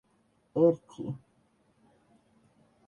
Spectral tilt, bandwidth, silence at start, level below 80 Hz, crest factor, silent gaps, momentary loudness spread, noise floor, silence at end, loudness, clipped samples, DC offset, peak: -10 dB/octave; 7 kHz; 0.55 s; -74 dBFS; 22 dB; none; 15 LU; -70 dBFS; 1.7 s; -29 LUFS; under 0.1%; under 0.1%; -12 dBFS